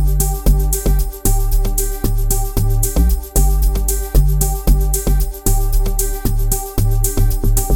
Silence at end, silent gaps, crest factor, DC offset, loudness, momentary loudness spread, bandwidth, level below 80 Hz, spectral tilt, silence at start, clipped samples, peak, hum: 0 s; none; 14 dB; under 0.1%; -18 LUFS; 3 LU; 17.5 kHz; -14 dBFS; -5 dB/octave; 0 s; under 0.1%; 0 dBFS; none